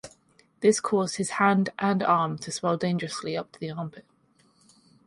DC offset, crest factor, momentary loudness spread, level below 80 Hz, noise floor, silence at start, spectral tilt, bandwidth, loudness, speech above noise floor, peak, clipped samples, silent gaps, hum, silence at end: under 0.1%; 20 dB; 12 LU; -68 dBFS; -64 dBFS; 0.05 s; -5 dB/octave; 11.5 kHz; -26 LUFS; 38 dB; -8 dBFS; under 0.1%; none; none; 1.05 s